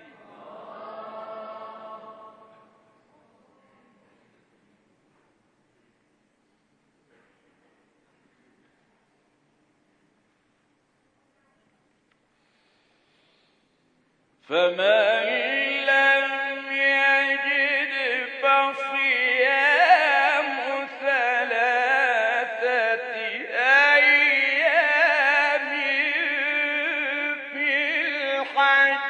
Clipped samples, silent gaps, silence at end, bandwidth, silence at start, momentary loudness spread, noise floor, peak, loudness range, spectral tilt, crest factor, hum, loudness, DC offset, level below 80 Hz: under 0.1%; none; 0 s; 9.2 kHz; 0.4 s; 12 LU; -68 dBFS; -4 dBFS; 9 LU; -2 dB/octave; 20 dB; none; -20 LUFS; under 0.1%; -86 dBFS